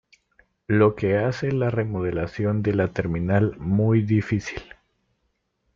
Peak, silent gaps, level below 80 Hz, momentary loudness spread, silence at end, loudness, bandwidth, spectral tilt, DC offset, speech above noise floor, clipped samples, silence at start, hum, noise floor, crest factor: -6 dBFS; none; -50 dBFS; 7 LU; 1.15 s; -23 LUFS; 7.2 kHz; -8.5 dB/octave; under 0.1%; 51 dB; under 0.1%; 0.7 s; none; -73 dBFS; 16 dB